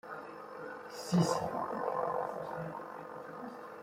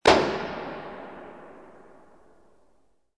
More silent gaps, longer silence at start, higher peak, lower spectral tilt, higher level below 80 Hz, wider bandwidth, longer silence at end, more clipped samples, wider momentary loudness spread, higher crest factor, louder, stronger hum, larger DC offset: neither; about the same, 0.05 s vs 0.05 s; second, -18 dBFS vs -4 dBFS; first, -6 dB/octave vs -4 dB/octave; second, -72 dBFS vs -52 dBFS; first, 16 kHz vs 10.5 kHz; second, 0 s vs 1.6 s; neither; second, 15 LU vs 27 LU; about the same, 20 dB vs 24 dB; second, -37 LUFS vs -27 LUFS; neither; second, under 0.1% vs 0.2%